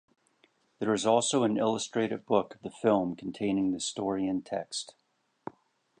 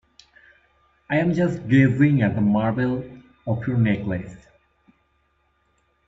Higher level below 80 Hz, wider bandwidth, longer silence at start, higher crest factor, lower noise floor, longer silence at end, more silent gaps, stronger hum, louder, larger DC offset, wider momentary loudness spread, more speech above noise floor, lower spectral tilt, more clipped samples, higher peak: second, -68 dBFS vs -52 dBFS; first, 10.5 kHz vs 7.8 kHz; second, 0.8 s vs 1.1 s; about the same, 20 dB vs 18 dB; about the same, -69 dBFS vs -67 dBFS; second, 1.1 s vs 1.7 s; neither; neither; second, -30 LUFS vs -21 LUFS; neither; first, 17 LU vs 13 LU; second, 40 dB vs 46 dB; second, -4.5 dB/octave vs -9 dB/octave; neither; second, -10 dBFS vs -4 dBFS